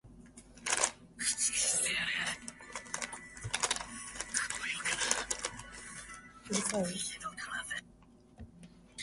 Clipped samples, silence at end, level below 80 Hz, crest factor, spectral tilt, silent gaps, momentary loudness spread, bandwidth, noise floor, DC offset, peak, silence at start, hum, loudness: under 0.1%; 0 s; -62 dBFS; 30 dB; -1 dB/octave; none; 20 LU; 12 kHz; -60 dBFS; under 0.1%; -8 dBFS; 0.05 s; none; -34 LUFS